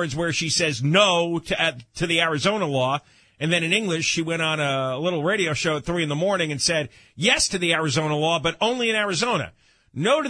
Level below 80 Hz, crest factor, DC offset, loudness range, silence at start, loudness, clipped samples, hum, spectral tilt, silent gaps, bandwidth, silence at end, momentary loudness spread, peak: -52 dBFS; 20 dB; under 0.1%; 1 LU; 0 s; -22 LUFS; under 0.1%; none; -3.5 dB/octave; none; 10.5 kHz; 0 s; 6 LU; -2 dBFS